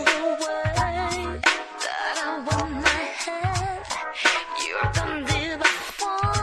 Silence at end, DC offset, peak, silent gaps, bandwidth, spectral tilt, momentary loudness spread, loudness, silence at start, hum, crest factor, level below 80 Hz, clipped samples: 0 s; under 0.1%; -4 dBFS; none; 13 kHz; -3.5 dB/octave; 6 LU; -24 LUFS; 0 s; none; 22 dB; -40 dBFS; under 0.1%